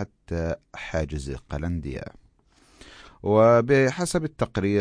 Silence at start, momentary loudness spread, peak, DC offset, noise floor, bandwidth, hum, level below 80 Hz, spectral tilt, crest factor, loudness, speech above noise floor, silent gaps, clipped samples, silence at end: 0 s; 16 LU; -8 dBFS; under 0.1%; -59 dBFS; 10.5 kHz; none; -42 dBFS; -6.5 dB/octave; 18 dB; -24 LUFS; 36 dB; none; under 0.1%; 0 s